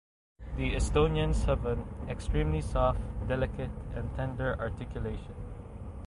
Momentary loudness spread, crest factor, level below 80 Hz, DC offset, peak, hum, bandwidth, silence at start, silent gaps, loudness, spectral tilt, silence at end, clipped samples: 15 LU; 18 dB; -36 dBFS; under 0.1%; -12 dBFS; none; 11.5 kHz; 0.4 s; none; -32 LUFS; -6.5 dB/octave; 0 s; under 0.1%